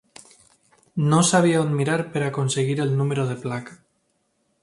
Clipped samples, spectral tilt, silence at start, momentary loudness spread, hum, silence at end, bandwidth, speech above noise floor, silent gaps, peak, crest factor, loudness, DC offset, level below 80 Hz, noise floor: under 0.1%; -5.5 dB/octave; 0.95 s; 14 LU; none; 0.9 s; 11.5 kHz; 49 dB; none; -4 dBFS; 18 dB; -22 LUFS; under 0.1%; -62 dBFS; -70 dBFS